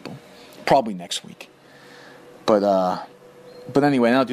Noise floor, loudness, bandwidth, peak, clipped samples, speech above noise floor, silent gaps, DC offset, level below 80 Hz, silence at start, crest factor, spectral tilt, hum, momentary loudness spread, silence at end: -47 dBFS; -21 LUFS; 15.5 kHz; -4 dBFS; under 0.1%; 27 dB; none; under 0.1%; -62 dBFS; 0.05 s; 18 dB; -5.5 dB/octave; none; 24 LU; 0 s